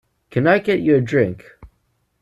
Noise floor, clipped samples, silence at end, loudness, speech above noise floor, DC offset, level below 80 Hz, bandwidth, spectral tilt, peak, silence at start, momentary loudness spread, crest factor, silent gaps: -67 dBFS; under 0.1%; 0.55 s; -18 LUFS; 50 dB; under 0.1%; -54 dBFS; 12 kHz; -8 dB/octave; -4 dBFS; 0.35 s; 9 LU; 16 dB; none